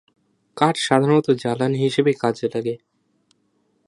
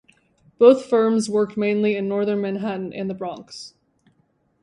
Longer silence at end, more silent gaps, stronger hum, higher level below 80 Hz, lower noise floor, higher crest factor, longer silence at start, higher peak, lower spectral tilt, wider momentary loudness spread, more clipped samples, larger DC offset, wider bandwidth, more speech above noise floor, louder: first, 1.1 s vs 0.95 s; neither; neither; about the same, -66 dBFS vs -68 dBFS; about the same, -66 dBFS vs -65 dBFS; about the same, 22 dB vs 20 dB; about the same, 0.55 s vs 0.6 s; about the same, 0 dBFS vs -2 dBFS; about the same, -6 dB/octave vs -6 dB/octave; second, 9 LU vs 19 LU; neither; neither; about the same, 11.5 kHz vs 11 kHz; about the same, 47 dB vs 45 dB; about the same, -20 LUFS vs -20 LUFS